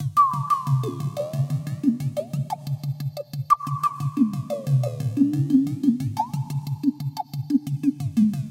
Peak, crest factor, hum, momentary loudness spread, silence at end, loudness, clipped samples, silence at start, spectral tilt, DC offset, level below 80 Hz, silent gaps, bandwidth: -6 dBFS; 18 dB; none; 9 LU; 0 s; -24 LUFS; under 0.1%; 0 s; -8.5 dB/octave; under 0.1%; -60 dBFS; none; 16.5 kHz